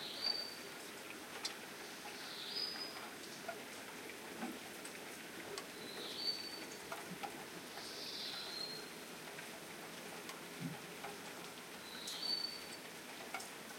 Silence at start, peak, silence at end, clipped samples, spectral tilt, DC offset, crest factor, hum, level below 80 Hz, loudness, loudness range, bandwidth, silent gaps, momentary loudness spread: 0 s; -26 dBFS; 0 s; under 0.1%; -2 dB/octave; under 0.1%; 22 dB; none; -84 dBFS; -45 LUFS; 3 LU; 16.5 kHz; none; 9 LU